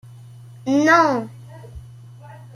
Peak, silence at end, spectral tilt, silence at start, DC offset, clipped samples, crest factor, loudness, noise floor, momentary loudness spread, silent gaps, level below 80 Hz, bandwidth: -2 dBFS; 0.1 s; -5 dB/octave; 0.65 s; under 0.1%; under 0.1%; 20 dB; -17 LUFS; -41 dBFS; 26 LU; none; -52 dBFS; 12.5 kHz